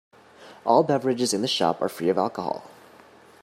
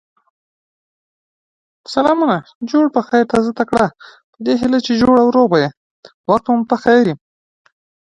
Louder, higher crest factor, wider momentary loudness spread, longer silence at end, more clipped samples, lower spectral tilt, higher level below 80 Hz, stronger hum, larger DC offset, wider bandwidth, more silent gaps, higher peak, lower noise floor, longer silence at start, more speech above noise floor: second, -24 LUFS vs -15 LUFS; about the same, 20 dB vs 16 dB; about the same, 11 LU vs 9 LU; second, 0.75 s vs 0.95 s; neither; second, -4.5 dB/octave vs -6.5 dB/octave; second, -72 dBFS vs -50 dBFS; neither; neither; first, 16 kHz vs 10.5 kHz; second, none vs 2.55-2.61 s, 4.24-4.33 s, 5.77-6.03 s, 6.14-6.24 s; second, -6 dBFS vs 0 dBFS; second, -51 dBFS vs under -90 dBFS; second, 0.4 s vs 1.9 s; second, 28 dB vs over 76 dB